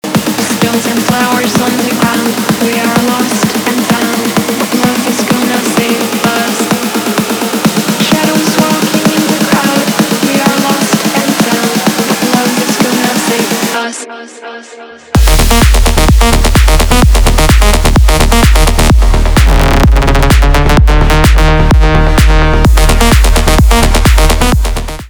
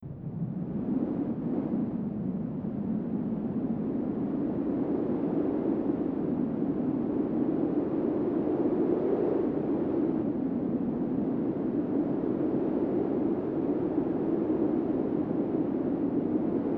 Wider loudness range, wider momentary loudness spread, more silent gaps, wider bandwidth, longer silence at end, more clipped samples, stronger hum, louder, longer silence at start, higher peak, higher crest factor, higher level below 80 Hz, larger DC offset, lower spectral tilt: about the same, 3 LU vs 3 LU; about the same, 4 LU vs 4 LU; neither; first, over 20 kHz vs 4.1 kHz; about the same, 0 s vs 0 s; first, 0.2% vs under 0.1%; neither; first, -9 LUFS vs -30 LUFS; about the same, 0.05 s vs 0 s; first, 0 dBFS vs -14 dBFS; second, 8 dB vs 14 dB; first, -12 dBFS vs -58 dBFS; neither; second, -4.5 dB/octave vs -12 dB/octave